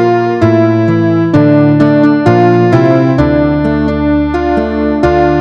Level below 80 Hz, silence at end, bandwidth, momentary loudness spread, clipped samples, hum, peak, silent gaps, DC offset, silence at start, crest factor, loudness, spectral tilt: -28 dBFS; 0 s; 6.8 kHz; 4 LU; 0.2%; none; 0 dBFS; none; under 0.1%; 0 s; 8 dB; -9 LUFS; -9 dB/octave